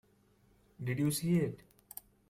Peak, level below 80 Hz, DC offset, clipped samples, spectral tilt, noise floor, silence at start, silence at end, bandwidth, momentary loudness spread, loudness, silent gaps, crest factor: -20 dBFS; -68 dBFS; under 0.1%; under 0.1%; -6 dB/octave; -68 dBFS; 0.8 s; 0.75 s; 16 kHz; 19 LU; -34 LUFS; none; 16 dB